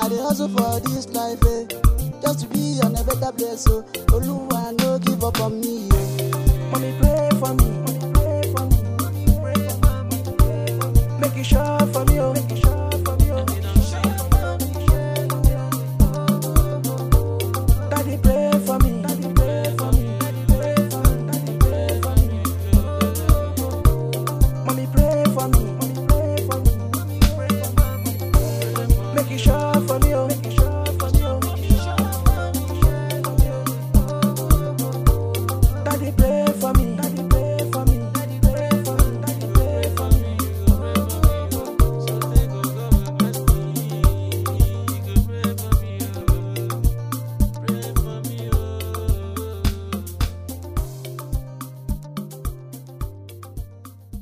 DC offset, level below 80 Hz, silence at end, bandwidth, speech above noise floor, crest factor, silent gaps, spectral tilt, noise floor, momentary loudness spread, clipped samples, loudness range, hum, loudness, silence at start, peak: under 0.1%; -22 dBFS; 0 s; 16 kHz; 22 dB; 18 dB; none; -6 dB/octave; -41 dBFS; 7 LU; under 0.1%; 5 LU; none; -21 LUFS; 0 s; -2 dBFS